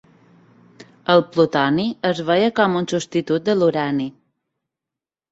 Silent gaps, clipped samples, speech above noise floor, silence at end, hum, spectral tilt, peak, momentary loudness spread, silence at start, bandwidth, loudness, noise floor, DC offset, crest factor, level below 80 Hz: none; under 0.1%; 69 dB; 1.2 s; none; -6 dB/octave; -2 dBFS; 6 LU; 0.8 s; 8 kHz; -19 LUFS; -87 dBFS; under 0.1%; 18 dB; -62 dBFS